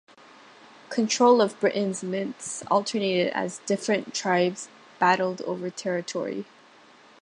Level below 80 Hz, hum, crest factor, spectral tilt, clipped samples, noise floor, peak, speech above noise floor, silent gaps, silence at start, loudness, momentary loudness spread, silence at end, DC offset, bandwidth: -76 dBFS; none; 20 dB; -4 dB/octave; under 0.1%; -53 dBFS; -6 dBFS; 29 dB; none; 0.9 s; -25 LUFS; 12 LU; 0.8 s; under 0.1%; 11.5 kHz